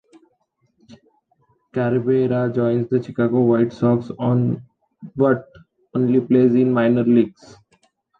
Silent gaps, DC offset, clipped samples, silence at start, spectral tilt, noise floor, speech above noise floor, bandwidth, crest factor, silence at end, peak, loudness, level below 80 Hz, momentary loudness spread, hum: none; under 0.1%; under 0.1%; 0.9 s; -10 dB/octave; -67 dBFS; 49 dB; 6 kHz; 16 dB; 0.9 s; -4 dBFS; -19 LUFS; -60 dBFS; 8 LU; none